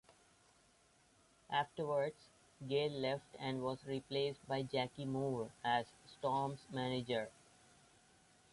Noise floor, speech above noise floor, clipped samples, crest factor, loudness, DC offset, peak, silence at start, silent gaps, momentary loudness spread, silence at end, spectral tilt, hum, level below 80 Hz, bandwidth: -71 dBFS; 31 dB; under 0.1%; 18 dB; -41 LUFS; under 0.1%; -24 dBFS; 1.5 s; none; 6 LU; 1.25 s; -6 dB/octave; none; -76 dBFS; 11.5 kHz